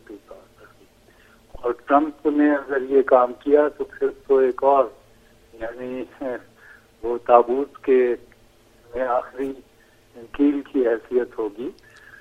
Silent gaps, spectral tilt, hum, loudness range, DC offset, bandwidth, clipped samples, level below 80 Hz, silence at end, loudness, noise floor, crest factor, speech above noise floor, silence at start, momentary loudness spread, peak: none; -7 dB/octave; none; 5 LU; under 0.1%; 7 kHz; under 0.1%; -54 dBFS; 0.5 s; -21 LUFS; -54 dBFS; 22 dB; 33 dB; 0.1 s; 17 LU; 0 dBFS